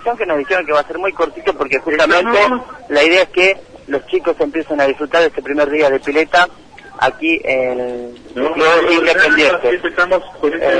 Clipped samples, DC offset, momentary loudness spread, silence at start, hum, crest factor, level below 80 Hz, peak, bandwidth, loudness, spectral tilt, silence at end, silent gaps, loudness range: under 0.1%; under 0.1%; 9 LU; 0 s; none; 14 dB; -46 dBFS; 0 dBFS; 10.5 kHz; -14 LUFS; -3.5 dB/octave; 0 s; none; 2 LU